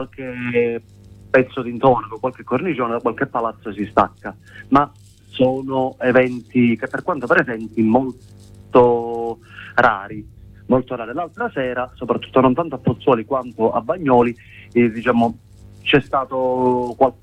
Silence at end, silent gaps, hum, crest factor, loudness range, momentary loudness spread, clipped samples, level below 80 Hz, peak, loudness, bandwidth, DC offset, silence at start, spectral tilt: 0.1 s; none; none; 18 dB; 3 LU; 11 LU; under 0.1%; -48 dBFS; -2 dBFS; -19 LUFS; 9 kHz; under 0.1%; 0 s; -8 dB/octave